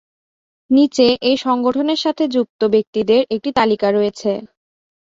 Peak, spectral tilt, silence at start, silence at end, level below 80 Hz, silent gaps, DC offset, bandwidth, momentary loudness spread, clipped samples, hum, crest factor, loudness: -2 dBFS; -5 dB/octave; 0.7 s; 0.7 s; -56 dBFS; 2.50-2.59 s, 2.87-2.93 s; under 0.1%; 7.8 kHz; 5 LU; under 0.1%; none; 16 dB; -17 LUFS